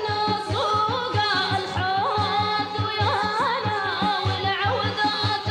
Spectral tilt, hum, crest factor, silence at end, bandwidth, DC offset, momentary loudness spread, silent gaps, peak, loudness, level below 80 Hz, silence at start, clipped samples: -5 dB/octave; none; 12 dB; 0 s; 11.5 kHz; under 0.1%; 2 LU; none; -12 dBFS; -23 LUFS; -52 dBFS; 0 s; under 0.1%